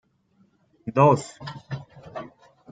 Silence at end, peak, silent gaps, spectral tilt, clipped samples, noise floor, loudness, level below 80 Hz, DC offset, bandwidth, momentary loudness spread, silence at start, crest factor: 0.45 s; -4 dBFS; none; -7 dB/octave; under 0.1%; -64 dBFS; -21 LUFS; -64 dBFS; under 0.1%; 9.2 kHz; 21 LU; 0.85 s; 22 dB